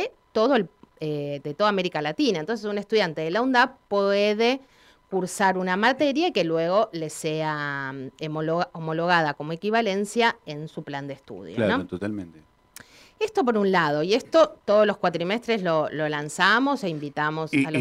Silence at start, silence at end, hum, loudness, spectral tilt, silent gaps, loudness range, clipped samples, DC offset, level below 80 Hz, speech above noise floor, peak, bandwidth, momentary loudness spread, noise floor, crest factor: 0 s; 0 s; none; -24 LUFS; -5 dB/octave; none; 4 LU; under 0.1%; under 0.1%; -66 dBFS; 26 dB; -6 dBFS; 15 kHz; 12 LU; -50 dBFS; 18 dB